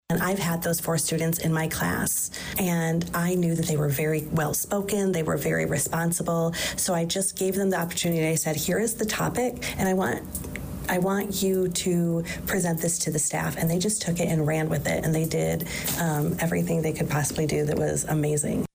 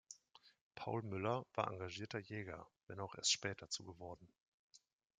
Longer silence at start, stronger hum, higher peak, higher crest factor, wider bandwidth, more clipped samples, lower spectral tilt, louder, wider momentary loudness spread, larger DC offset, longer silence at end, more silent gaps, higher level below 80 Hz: about the same, 0.1 s vs 0.1 s; neither; first, -16 dBFS vs -20 dBFS; second, 10 dB vs 26 dB; first, 16 kHz vs 9.6 kHz; neither; first, -4.5 dB/octave vs -3 dB/octave; first, -25 LUFS vs -43 LUFS; second, 2 LU vs 18 LU; neither; second, 0.1 s vs 0.4 s; second, none vs 0.61-0.71 s, 2.83-2.87 s, 4.40-4.70 s; first, -48 dBFS vs -80 dBFS